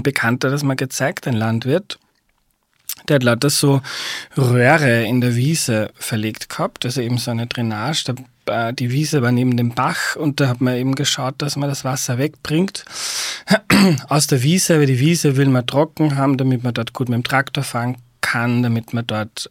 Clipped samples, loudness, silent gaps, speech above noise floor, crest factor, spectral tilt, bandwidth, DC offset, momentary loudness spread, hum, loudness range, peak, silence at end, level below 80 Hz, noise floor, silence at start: under 0.1%; -18 LUFS; none; 47 dB; 18 dB; -5 dB/octave; 17 kHz; under 0.1%; 9 LU; none; 5 LU; 0 dBFS; 0.05 s; -56 dBFS; -64 dBFS; 0 s